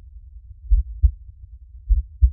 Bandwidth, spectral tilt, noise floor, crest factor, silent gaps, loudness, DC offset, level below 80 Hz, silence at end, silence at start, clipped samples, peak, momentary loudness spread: 0.2 kHz; -14 dB/octave; -42 dBFS; 18 dB; none; -24 LUFS; under 0.1%; -22 dBFS; 0 s; 0.15 s; under 0.1%; -4 dBFS; 24 LU